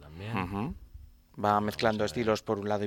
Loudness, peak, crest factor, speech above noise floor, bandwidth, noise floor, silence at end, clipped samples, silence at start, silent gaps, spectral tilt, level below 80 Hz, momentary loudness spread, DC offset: -30 LUFS; -10 dBFS; 22 dB; 23 dB; 16.5 kHz; -51 dBFS; 0 s; under 0.1%; 0 s; none; -6 dB/octave; -54 dBFS; 9 LU; under 0.1%